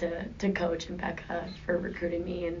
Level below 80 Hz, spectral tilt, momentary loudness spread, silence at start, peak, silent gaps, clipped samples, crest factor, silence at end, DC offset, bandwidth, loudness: -50 dBFS; -5 dB/octave; 6 LU; 0 s; -16 dBFS; none; under 0.1%; 16 dB; 0 s; under 0.1%; 7.4 kHz; -33 LUFS